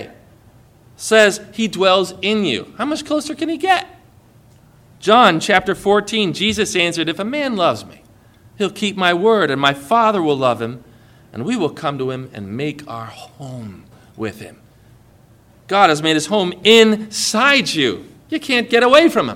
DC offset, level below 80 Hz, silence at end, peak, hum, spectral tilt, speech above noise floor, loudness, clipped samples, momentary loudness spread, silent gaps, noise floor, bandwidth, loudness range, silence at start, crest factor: under 0.1%; -54 dBFS; 0 s; 0 dBFS; none; -3.5 dB/octave; 32 dB; -16 LUFS; under 0.1%; 18 LU; none; -49 dBFS; 17 kHz; 11 LU; 0 s; 18 dB